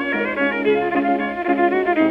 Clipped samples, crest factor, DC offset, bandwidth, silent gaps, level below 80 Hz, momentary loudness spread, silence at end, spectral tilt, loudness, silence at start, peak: under 0.1%; 12 dB; under 0.1%; 5.6 kHz; none; -54 dBFS; 3 LU; 0 s; -7.5 dB/octave; -19 LUFS; 0 s; -6 dBFS